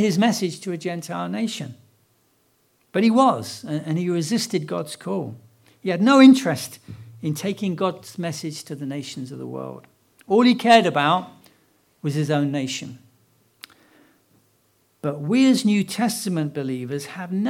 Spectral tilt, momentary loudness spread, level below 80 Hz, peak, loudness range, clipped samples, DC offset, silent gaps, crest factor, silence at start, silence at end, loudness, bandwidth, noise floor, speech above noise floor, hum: -5.5 dB/octave; 17 LU; -72 dBFS; 0 dBFS; 9 LU; under 0.1%; under 0.1%; none; 22 dB; 0 s; 0 s; -21 LUFS; 15.5 kHz; -64 dBFS; 43 dB; none